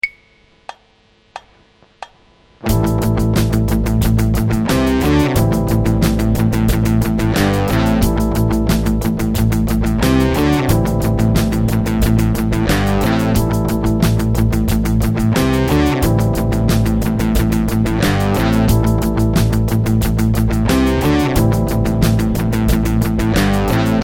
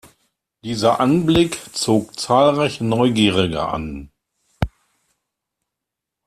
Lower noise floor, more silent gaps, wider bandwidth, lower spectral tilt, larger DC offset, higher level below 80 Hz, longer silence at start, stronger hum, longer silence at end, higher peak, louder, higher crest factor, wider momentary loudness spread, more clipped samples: second, -53 dBFS vs -83 dBFS; neither; first, 17.5 kHz vs 14 kHz; about the same, -6.5 dB/octave vs -5.5 dB/octave; neither; first, -22 dBFS vs -42 dBFS; second, 0.05 s vs 0.65 s; neither; second, 0 s vs 1.6 s; about the same, 0 dBFS vs -2 dBFS; first, -15 LUFS vs -18 LUFS; about the same, 14 dB vs 18 dB; second, 2 LU vs 12 LU; neither